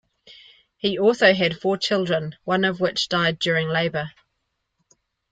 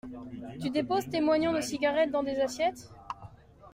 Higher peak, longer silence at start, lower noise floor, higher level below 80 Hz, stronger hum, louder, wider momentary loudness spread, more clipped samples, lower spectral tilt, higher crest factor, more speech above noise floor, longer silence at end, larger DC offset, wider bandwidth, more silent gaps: first, -4 dBFS vs -16 dBFS; first, 0.3 s vs 0.05 s; first, -76 dBFS vs -51 dBFS; about the same, -62 dBFS vs -60 dBFS; neither; first, -21 LUFS vs -29 LUFS; second, 9 LU vs 17 LU; neither; about the same, -5 dB/octave vs -4.5 dB/octave; about the same, 20 dB vs 16 dB; first, 55 dB vs 22 dB; first, 1.2 s vs 0 s; neither; second, 9.2 kHz vs 16 kHz; neither